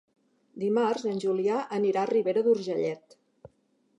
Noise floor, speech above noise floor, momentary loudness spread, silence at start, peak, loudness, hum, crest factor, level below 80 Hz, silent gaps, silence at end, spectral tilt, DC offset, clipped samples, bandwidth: -70 dBFS; 43 dB; 7 LU; 0.55 s; -14 dBFS; -27 LUFS; none; 16 dB; -78 dBFS; none; 0.5 s; -6.5 dB/octave; under 0.1%; under 0.1%; 10 kHz